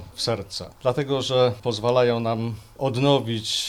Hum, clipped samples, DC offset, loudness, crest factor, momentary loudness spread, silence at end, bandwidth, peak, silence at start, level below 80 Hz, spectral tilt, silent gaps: none; under 0.1%; under 0.1%; -23 LUFS; 18 dB; 8 LU; 0 s; 15.5 kHz; -6 dBFS; 0 s; -54 dBFS; -5 dB/octave; none